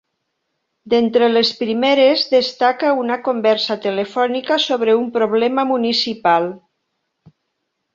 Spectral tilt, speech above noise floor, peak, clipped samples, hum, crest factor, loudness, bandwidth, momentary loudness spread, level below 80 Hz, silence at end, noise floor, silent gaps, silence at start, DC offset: -4.5 dB/octave; 57 dB; -2 dBFS; under 0.1%; none; 16 dB; -16 LUFS; 7.6 kHz; 6 LU; -66 dBFS; 1.35 s; -74 dBFS; none; 0.85 s; under 0.1%